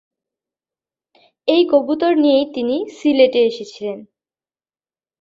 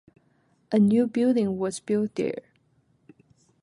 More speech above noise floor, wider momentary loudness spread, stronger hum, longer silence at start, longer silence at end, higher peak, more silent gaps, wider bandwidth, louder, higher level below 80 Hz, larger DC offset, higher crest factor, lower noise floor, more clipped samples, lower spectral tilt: first, over 74 dB vs 43 dB; first, 14 LU vs 9 LU; neither; first, 1.45 s vs 0.7 s; about the same, 1.2 s vs 1.25 s; first, -2 dBFS vs -10 dBFS; neither; second, 7.6 kHz vs 11.5 kHz; first, -16 LUFS vs -24 LUFS; about the same, -66 dBFS vs -68 dBFS; neither; about the same, 16 dB vs 16 dB; first, under -90 dBFS vs -66 dBFS; neither; second, -5 dB/octave vs -7 dB/octave